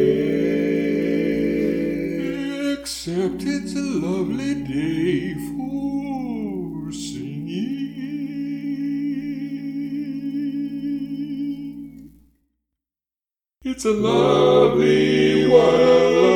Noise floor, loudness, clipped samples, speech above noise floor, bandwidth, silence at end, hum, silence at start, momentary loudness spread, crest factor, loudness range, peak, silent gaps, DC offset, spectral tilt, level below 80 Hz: under -90 dBFS; -21 LUFS; under 0.1%; over 72 dB; 16.5 kHz; 0 s; none; 0 s; 14 LU; 20 dB; 11 LU; -2 dBFS; none; under 0.1%; -6 dB/octave; -50 dBFS